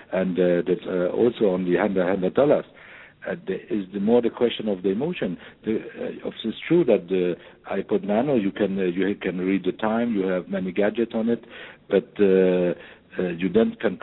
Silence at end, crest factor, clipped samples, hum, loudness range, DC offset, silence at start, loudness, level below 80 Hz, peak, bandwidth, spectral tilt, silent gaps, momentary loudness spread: 0.05 s; 18 dB; under 0.1%; none; 3 LU; under 0.1%; 0 s; -24 LUFS; -58 dBFS; -6 dBFS; 4.1 kHz; -11 dB/octave; none; 11 LU